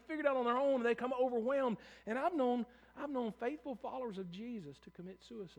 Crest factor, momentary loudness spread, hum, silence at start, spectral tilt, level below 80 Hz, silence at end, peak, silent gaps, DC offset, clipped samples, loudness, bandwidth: 18 dB; 17 LU; none; 0.1 s; -6.5 dB/octave; -74 dBFS; 0.05 s; -20 dBFS; none; under 0.1%; under 0.1%; -38 LUFS; 9.6 kHz